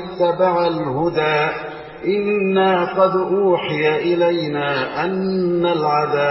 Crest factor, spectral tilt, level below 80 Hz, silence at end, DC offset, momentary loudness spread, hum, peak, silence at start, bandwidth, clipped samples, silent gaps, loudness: 14 dB; -9.5 dB/octave; -54 dBFS; 0 s; under 0.1%; 5 LU; none; -4 dBFS; 0 s; 5.8 kHz; under 0.1%; none; -18 LUFS